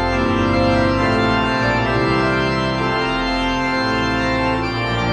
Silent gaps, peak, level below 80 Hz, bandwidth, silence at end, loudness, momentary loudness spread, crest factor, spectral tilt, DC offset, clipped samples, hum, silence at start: none; -4 dBFS; -32 dBFS; 11 kHz; 0 s; -18 LUFS; 3 LU; 14 dB; -6 dB/octave; under 0.1%; under 0.1%; none; 0 s